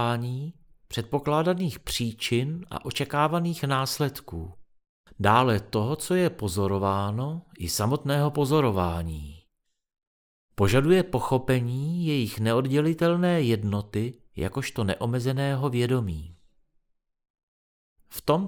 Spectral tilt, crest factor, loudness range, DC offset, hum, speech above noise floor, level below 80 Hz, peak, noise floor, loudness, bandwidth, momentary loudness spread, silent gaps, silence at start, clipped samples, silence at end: -6 dB/octave; 20 dB; 4 LU; under 0.1%; none; 49 dB; -50 dBFS; -6 dBFS; -75 dBFS; -26 LUFS; over 20 kHz; 12 LU; 4.89-5.04 s, 10.07-10.49 s, 17.30-17.34 s, 17.43-17.96 s; 0 s; under 0.1%; 0 s